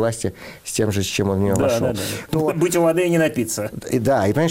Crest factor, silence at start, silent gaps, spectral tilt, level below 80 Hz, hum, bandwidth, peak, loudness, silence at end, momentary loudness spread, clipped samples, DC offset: 12 dB; 0 s; none; -5 dB/octave; -48 dBFS; none; 16.5 kHz; -8 dBFS; -20 LUFS; 0 s; 8 LU; under 0.1%; under 0.1%